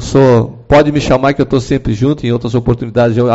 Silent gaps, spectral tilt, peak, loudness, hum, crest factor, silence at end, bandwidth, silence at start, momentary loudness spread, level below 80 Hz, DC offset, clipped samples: none; -7 dB/octave; 0 dBFS; -12 LUFS; none; 10 dB; 0 s; 8 kHz; 0 s; 6 LU; -30 dBFS; under 0.1%; under 0.1%